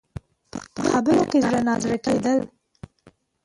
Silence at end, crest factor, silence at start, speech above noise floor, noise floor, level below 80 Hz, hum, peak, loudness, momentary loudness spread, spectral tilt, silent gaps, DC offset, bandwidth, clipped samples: 1 s; 16 dB; 0.55 s; 36 dB; -57 dBFS; -52 dBFS; none; -8 dBFS; -21 LUFS; 19 LU; -5.5 dB/octave; none; under 0.1%; 11.5 kHz; under 0.1%